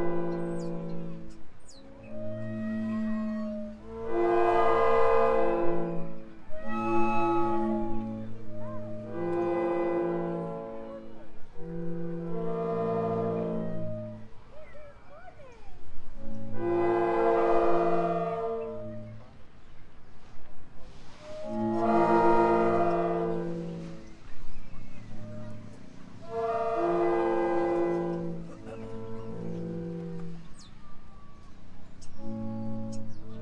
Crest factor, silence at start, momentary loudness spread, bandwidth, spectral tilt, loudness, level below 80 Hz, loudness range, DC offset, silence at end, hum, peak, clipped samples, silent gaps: 18 dB; 0 s; 24 LU; 8.8 kHz; -8 dB/octave; -30 LUFS; -48 dBFS; 13 LU; under 0.1%; 0 s; none; -10 dBFS; under 0.1%; none